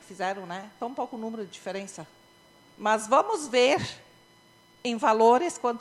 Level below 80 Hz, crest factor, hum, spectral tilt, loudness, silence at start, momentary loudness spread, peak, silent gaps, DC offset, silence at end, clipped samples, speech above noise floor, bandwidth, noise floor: -70 dBFS; 20 dB; none; -3.5 dB/octave; -26 LUFS; 0.1 s; 16 LU; -8 dBFS; none; under 0.1%; 0 s; under 0.1%; 32 dB; 13 kHz; -58 dBFS